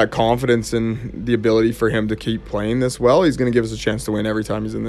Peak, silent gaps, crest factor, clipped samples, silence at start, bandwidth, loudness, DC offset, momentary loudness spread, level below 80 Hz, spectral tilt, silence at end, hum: -2 dBFS; none; 16 dB; under 0.1%; 0 s; 14 kHz; -19 LUFS; under 0.1%; 8 LU; -38 dBFS; -6 dB/octave; 0 s; none